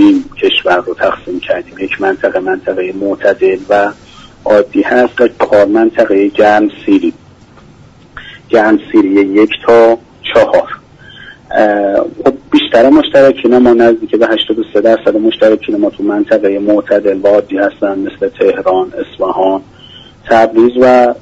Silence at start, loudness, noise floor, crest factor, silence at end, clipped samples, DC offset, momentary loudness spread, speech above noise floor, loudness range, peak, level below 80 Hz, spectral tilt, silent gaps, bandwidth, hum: 0 s; -10 LUFS; -39 dBFS; 10 dB; 0.05 s; 0.1%; under 0.1%; 9 LU; 30 dB; 4 LU; 0 dBFS; -44 dBFS; -6 dB/octave; none; 8 kHz; none